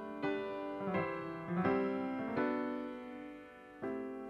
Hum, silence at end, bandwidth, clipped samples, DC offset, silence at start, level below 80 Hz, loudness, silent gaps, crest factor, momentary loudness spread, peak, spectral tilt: none; 0 s; 7 kHz; under 0.1%; under 0.1%; 0 s; -72 dBFS; -38 LUFS; none; 20 dB; 14 LU; -20 dBFS; -8.5 dB/octave